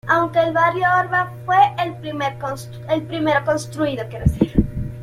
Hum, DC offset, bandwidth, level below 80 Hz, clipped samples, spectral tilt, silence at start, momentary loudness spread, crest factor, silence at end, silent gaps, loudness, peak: none; under 0.1%; 15.5 kHz; -34 dBFS; under 0.1%; -6.5 dB/octave; 0.05 s; 9 LU; 18 dB; 0 s; none; -19 LUFS; -2 dBFS